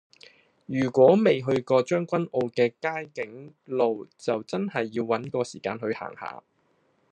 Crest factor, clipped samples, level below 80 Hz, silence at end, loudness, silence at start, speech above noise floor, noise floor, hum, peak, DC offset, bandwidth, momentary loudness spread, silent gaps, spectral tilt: 20 dB; under 0.1%; -76 dBFS; 0.75 s; -26 LUFS; 0.7 s; 42 dB; -68 dBFS; none; -6 dBFS; under 0.1%; 9.4 kHz; 17 LU; none; -6.5 dB/octave